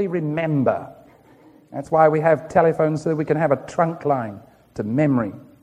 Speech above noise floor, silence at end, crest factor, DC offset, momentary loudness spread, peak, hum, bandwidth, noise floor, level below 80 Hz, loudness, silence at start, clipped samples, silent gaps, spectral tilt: 31 dB; 0.2 s; 20 dB; under 0.1%; 15 LU; -2 dBFS; none; 10 kHz; -50 dBFS; -58 dBFS; -20 LUFS; 0 s; under 0.1%; none; -8.5 dB/octave